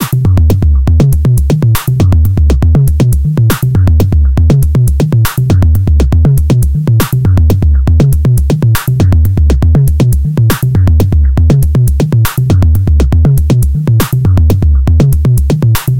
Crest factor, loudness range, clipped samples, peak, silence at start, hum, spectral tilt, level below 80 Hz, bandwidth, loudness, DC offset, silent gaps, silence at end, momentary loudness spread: 6 dB; 0 LU; 0.1%; 0 dBFS; 0 s; none; -7 dB/octave; -12 dBFS; 17.5 kHz; -9 LUFS; under 0.1%; none; 0 s; 2 LU